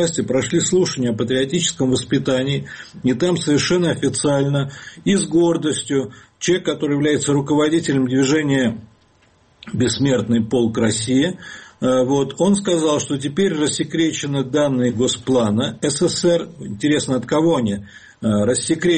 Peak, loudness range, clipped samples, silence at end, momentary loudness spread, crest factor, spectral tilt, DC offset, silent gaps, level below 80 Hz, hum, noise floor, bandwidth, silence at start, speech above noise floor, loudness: -6 dBFS; 1 LU; under 0.1%; 0 s; 6 LU; 12 dB; -5 dB/octave; under 0.1%; none; -52 dBFS; none; -55 dBFS; 9 kHz; 0 s; 37 dB; -18 LUFS